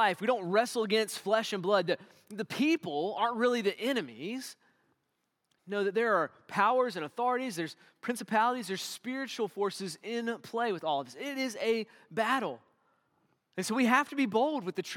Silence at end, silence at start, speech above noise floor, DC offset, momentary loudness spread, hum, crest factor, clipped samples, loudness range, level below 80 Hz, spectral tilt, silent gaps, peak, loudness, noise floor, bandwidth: 0 s; 0 s; 49 dB; under 0.1%; 11 LU; none; 22 dB; under 0.1%; 4 LU; -90 dBFS; -4 dB/octave; none; -10 dBFS; -31 LUFS; -81 dBFS; 18 kHz